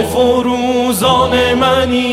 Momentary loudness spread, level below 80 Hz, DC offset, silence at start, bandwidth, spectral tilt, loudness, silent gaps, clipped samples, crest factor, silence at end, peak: 3 LU; -34 dBFS; under 0.1%; 0 s; 16 kHz; -4.5 dB/octave; -12 LUFS; none; under 0.1%; 12 dB; 0 s; 0 dBFS